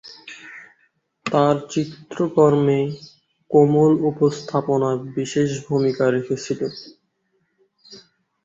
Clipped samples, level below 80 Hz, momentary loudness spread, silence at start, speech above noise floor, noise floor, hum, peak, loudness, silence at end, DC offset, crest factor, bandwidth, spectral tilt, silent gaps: under 0.1%; -60 dBFS; 21 LU; 0.05 s; 50 dB; -69 dBFS; none; -2 dBFS; -20 LUFS; 0.5 s; under 0.1%; 18 dB; 7.8 kHz; -7 dB/octave; none